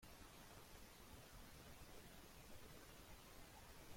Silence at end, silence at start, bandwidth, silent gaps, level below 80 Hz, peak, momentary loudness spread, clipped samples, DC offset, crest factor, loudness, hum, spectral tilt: 0 s; 0 s; 16.5 kHz; none; -68 dBFS; -46 dBFS; 1 LU; under 0.1%; under 0.1%; 16 dB; -62 LUFS; none; -3.5 dB/octave